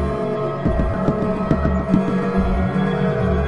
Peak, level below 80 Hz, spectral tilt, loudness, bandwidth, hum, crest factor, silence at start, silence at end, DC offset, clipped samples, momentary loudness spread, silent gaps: -4 dBFS; -28 dBFS; -9 dB/octave; -20 LUFS; 7 kHz; none; 16 dB; 0 s; 0 s; 0.9%; under 0.1%; 3 LU; none